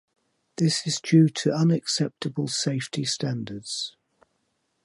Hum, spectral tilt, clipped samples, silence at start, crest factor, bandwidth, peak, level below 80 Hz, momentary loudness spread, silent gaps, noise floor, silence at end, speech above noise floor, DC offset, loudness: none; -5 dB/octave; under 0.1%; 0.6 s; 18 dB; 11.5 kHz; -6 dBFS; -70 dBFS; 12 LU; none; -74 dBFS; 0.95 s; 49 dB; under 0.1%; -25 LUFS